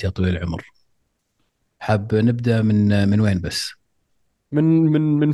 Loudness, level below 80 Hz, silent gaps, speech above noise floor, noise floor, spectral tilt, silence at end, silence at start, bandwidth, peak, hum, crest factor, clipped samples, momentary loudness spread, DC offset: -19 LUFS; -50 dBFS; none; 52 dB; -70 dBFS; -7 dB/octave; 0 s; 0 s; 12.5 kHz; -4 dBFS; none; 16 dB; under 0.1%; 11 LU; under 0.1%